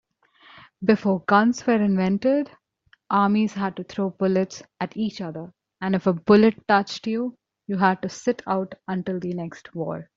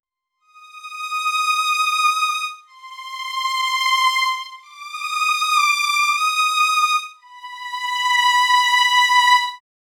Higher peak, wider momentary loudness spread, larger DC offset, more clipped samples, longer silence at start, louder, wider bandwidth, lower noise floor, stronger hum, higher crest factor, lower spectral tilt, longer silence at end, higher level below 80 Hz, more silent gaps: about the same, -4 dBFS vs -4 dBFS; second, 14 LU vs 19 LU; neither; neither; first, 0.8 s vs 0.6 s; second, -23 LUFS vs -17 LUFS; second, 7.6 kHz vs 19 kHz; about the same, -62 dBFS vs -63 dBFS; neither; about the same, 20 dB vs 16 dB; first, -6.5 dB/octave vs 8 dB/octave; second, 0.15 s vs 0.4 s; first, -62 dBFS vs -86 dBFS; neither